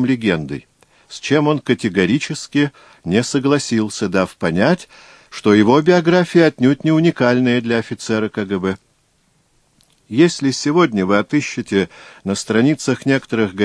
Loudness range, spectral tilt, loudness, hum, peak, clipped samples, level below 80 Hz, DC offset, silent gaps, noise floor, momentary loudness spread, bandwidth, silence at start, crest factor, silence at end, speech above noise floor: 5 LU; -5.5 dB/octave; -17 LUFS; none; 0 dBFS; under 0.1%; -54 dBFS; under 0.1%; none; -60 dBFS; 10 LU; 11 kHz; 0 s; 16 dB; 0 s; 44 dB